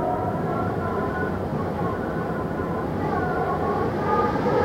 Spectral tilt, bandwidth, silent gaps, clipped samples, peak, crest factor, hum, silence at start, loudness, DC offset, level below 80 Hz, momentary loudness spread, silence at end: -8.5 dB/octave; 16.5 kHz; none; under 0.1%; -8 dBFS; 16 dB; none; 0 s; -25 LUFS; under 0.1%; -44 dBFS; 5 LU; 0 s